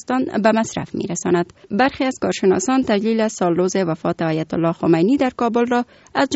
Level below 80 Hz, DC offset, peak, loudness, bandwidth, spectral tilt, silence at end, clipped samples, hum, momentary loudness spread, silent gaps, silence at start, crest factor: -54 dBFS; under 0.1%; -2 dBFS; -19 LUFS; 8 kHz; -5 dB/octave; 0 s; under 0.1%; none; 5 LU; none; 0.1 s; 16 dB